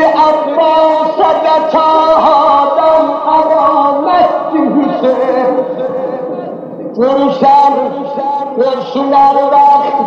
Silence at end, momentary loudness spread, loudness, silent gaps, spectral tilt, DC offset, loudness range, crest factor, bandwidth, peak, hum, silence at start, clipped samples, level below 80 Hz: 0 s; 9 LU; -10 LUFS; none; -6.5 dB/octave; under 0.1%; 4 LU; 10 dB; 7.4 kHz; 0 dBFS; none; 0 s; under 0.1%; -50 dBFS